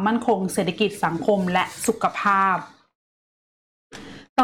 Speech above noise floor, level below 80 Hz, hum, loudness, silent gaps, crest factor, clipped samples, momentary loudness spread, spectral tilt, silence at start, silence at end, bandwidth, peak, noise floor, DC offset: over 68 dB; -60 dBFS; none; -22 LUFS; 2.95-3.90 s, 4.29-4.36 s; 14 dB; under 0.1%; 9 LU; -4.5 dB/octave; 0 s; 0 s; 17 kHz; -8 dBFS; under -90 dBFS; under 0.1%